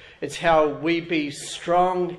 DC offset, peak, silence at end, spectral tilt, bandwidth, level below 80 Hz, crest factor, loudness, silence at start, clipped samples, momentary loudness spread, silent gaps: under 0.1%; -6 dBFS; 0 s; -4.5 dB/octave; 12.5 kHz; -52 dBFS; 18 dB; -22 LUFS; 0 s; under 0.1%; 11 LU; none